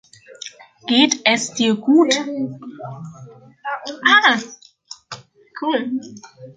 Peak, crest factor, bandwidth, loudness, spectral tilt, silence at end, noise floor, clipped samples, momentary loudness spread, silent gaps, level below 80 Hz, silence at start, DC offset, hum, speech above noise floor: -2 dBFS; 18 dB; 9.6 kHz; -17 LUFS; -2.5 dB/octave; 0.05 s; -43 dBFS; under 0.1%; 23 LU; none; -68 dBFS; 0.3 s; under 0.1%; none; 24 dB